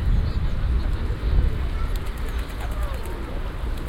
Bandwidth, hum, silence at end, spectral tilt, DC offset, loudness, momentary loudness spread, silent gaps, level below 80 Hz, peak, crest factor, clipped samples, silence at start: 16 kHz; none; 0 s; -7 dB/octave; under 0.1%; -28 LUFS; 7 LU; none; -24 dBFS; -8 dBFS; 16 dB; under 0.1%; 0 s